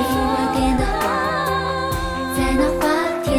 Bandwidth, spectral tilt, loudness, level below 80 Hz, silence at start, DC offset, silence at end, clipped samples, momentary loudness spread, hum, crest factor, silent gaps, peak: 17.5 kHz; -5 dB/octave; -20 LUFS; -30 dBFS; 0 s; under 0.1%; 0 s; under 0.1%; 4 LU; none; 14 dB; none; -6 dBFS